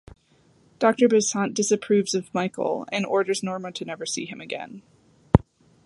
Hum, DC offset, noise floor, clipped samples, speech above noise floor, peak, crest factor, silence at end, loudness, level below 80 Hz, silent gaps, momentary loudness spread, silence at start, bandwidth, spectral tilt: none; under 0.1%; -60 dBFS; under 0.1%; 36 dB; 0 dBFS; 24 dB; 0.45 s; -24 LUFS; -42 dBFS; none; 13 LU; 0.8 s; 11.5 kHz; -5 dB/octave